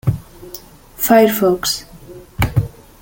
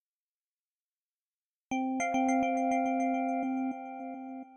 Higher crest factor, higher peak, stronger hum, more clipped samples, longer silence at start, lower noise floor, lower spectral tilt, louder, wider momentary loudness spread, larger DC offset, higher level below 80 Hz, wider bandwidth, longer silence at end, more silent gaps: about the same, 18 dB vs 14 dB; first, 0 dBFS vs -18 dBFS; neither; neither; second, 0.05 s vs 1.7 s; second, -38 dBFS vs under -90 dBFS; about the same, -5 dB/octave vs -4 dB/octave; first, -16 LUFS vs -32 LUFS; first, 23 LU vs 13 LU; neither; first, -36 dBFS vs -72 dBFS; first, 17 kHz vs 8.8 kHz; first, 0.35 s vs 0 s; neither